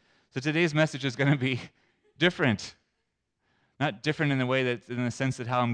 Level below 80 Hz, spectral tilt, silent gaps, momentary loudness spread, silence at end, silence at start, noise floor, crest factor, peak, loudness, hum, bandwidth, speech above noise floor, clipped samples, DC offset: -68 dBFS; -6 dB/octave; none; 9 LU; 0 s; 0.35 s; -80 dBFS; 18 dB; -10 dBFS; -28 LUFS; none; 10 kHz; 52 dB; under 0.1%; under 0.1%